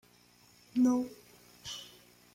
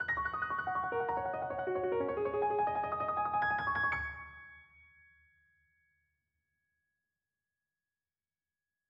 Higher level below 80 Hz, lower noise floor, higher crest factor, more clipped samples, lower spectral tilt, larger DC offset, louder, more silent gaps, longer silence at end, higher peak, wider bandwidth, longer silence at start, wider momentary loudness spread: second, -72 dBFS vs -62 dBFS; second, -63 dBFS vs under -90 dBFS; about the same, 16 dB vs 16 dB; neither; second, -4 dB/octave vs -7.5 dB/octave; neither; about the same, -33 LUFS vs -34 LUFS; neither; second, 0.45 s vs 4.25 s; about the same, -20 dBFS vs -22 dBFS; first, 16 kHz vs 7.4 kHz; first, 0.75 s vs 0 s; first, 22 LU vs 8 LU